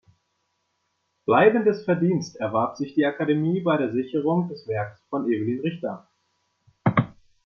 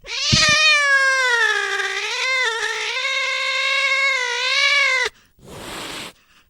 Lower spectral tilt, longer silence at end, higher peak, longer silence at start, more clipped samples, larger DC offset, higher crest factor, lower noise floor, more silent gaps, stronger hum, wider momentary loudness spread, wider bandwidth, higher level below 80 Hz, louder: first, -8 dB/octave vs -1 dB/octave; about the same, 0.4 s vs 0.4 s; second, -4 dBFS vs 0 dBFS; first, 1.3 s vs 0.05 s; neither; neither; about the same, 20 dB vs 20 dB; first, -74 dBFS vs -42 dBFS; neither; neither; second, 12 LU vs 17 LU; second, 6.8 kHz vs 17.5 kHz; second, -66 dBFS vs -48 dBFS; second, -24 LUFS vs -16 LUFS